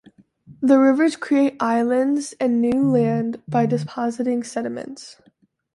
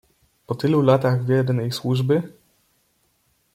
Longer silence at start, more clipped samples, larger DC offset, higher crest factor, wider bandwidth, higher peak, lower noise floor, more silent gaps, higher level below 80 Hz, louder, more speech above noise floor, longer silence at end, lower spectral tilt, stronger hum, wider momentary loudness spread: about the same, 0.5 s vs 0.5 s; neither; neither; about the same, 16 dB vs 18 dB; second, 11.5 kHz vs 15 kHz; about the same, -4 dBFS vs -4 dBFS; second, -60 dBFS vs -66 dBFS; neither; about the same, -62 dBFS vs -62 dBFS; about the same, -20 LUFS vs -21 LUFS; second, 40 dB vs 46 dB; second, 0.65 s vs 1.25 s; about the same, -6.5 dB/octave vs -7.5 dB/octave; neither; first, 11 LU vs 8 LU